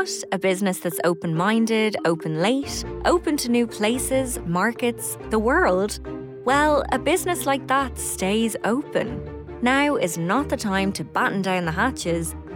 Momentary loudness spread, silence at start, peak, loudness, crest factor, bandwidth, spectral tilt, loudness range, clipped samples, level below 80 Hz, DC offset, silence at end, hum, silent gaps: 6 LU; 0 s; -10 dBFS; -22 LUFS; 12 dB; 18 kHz; -4.5 dB/octave; 1 LU; under 0.1%; -42 dBFS; under 0.1%; 0 s; none; none